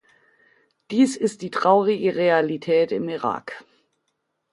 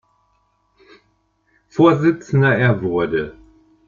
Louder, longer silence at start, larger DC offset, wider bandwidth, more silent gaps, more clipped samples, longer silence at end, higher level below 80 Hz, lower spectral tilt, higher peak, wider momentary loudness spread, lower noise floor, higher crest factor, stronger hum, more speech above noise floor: second, -21 LUFS vs -17 LUFS; second, 0.9 s vs 1.75 s; neither; first, 11.5 kHz vs 7.2 kHz; neither; neither; first, 0.9 s vs 0.55 s; second, -70 dBFS vs -52 dBFS; second, -5.5 dB/octave vs -8 dB/octave; about the same, -4 dBFS vs -2 dBFS; about the same, 9 LU vs 11 LU; first, -75 dBFS vs -64 dBFS; about the same, 20 dB vs 18 dB; second, none vs 50 Hz at -45 dBFS; first, 54 dB vs 48 dB